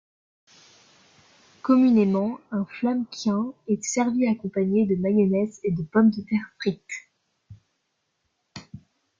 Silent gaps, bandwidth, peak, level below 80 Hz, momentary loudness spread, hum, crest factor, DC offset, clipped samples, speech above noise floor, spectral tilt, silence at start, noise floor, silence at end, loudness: none; 7.6 kHz; -8 dBFS; -64 dBFS; 16 LU; none; 18 dB; under 0.1%; under 0.1%; 53 dB; -6.5 dB/octave; 1.65 s; -75 dBFS; 0.4 s; -24 LUFS